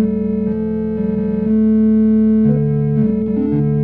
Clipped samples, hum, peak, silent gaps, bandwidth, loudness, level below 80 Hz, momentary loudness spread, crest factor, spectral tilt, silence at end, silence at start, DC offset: under 0.1%; none; -4 dBFS; none; 2.7 kHz; -15 LUFS; -36 dBFS; 6 LU; 10 dB; -13 dB/octave; 0 s; 0 s; under 0.1%